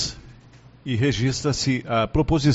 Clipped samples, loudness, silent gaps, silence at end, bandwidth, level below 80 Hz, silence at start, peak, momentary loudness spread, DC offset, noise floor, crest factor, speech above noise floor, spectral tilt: under 0.1%; -23 LUFS; none; 0 s; 8 kHz; -38 dBFS; 0 s; -6 dBFS; 10 LU; under 0.1%; -49 dBFS; 16 dB; 28 dB; -5.5 dB/octave